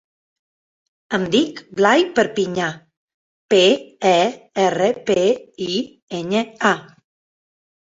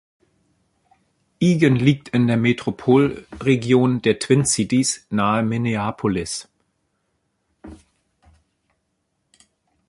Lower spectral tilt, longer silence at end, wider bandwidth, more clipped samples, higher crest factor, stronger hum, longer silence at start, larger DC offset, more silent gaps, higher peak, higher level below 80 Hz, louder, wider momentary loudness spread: about the same, -4.5 dB/octave vs -5.5 dB/octave; second, 1.1 s vs 2.15 s; second, 8 kHz vs 11.5 kHz; neither; about the same, 18 dB vs 20 dB; neither; second, 1.1 s vs 1.4 s; neither; first, 2.97-3.08 s, 3.14-3.49 s, 6.02-6.07 s vs none; about the same, -2 dBFS vs -2 dBFS; second, -62 dBFS vs -52 dBFS; about the same, -19 LUFS vs -19 LUFS; first, 10 LU vs 7 LU